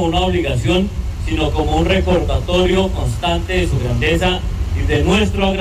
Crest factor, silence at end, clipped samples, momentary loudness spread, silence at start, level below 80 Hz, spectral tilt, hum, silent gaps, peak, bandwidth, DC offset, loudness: 10 dB; 0 s; under 0.1%; 6 LU; 0 s; -22 dBFS; -6 dB/octave; none; none; -6 dBFS; 14.5 kHz; under 0.1%; -17 LUFS